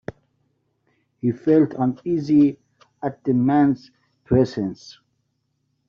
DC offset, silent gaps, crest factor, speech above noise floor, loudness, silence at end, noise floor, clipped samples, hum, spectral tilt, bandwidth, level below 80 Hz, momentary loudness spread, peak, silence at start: under 0.1%; none; 18 dB; 52 dB; -21 LUFS; 0.95 s; -72 dBFS; under 0.1%; none; -8.5 dB/octave; 6.8 kHz; -54 dBFS; 13 LU; -6 dBFS; 1.25 s